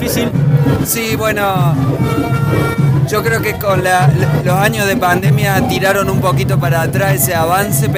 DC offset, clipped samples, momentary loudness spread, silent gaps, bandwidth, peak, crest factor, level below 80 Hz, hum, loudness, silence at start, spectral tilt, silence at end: under 0.1%; under 0.1%; 3 LU; none; 16 kHz; 0 dBFS; 12 dB; -36 dBFS; none; -13 LUFS; 0 s; -5.5 dB/octave; 0 s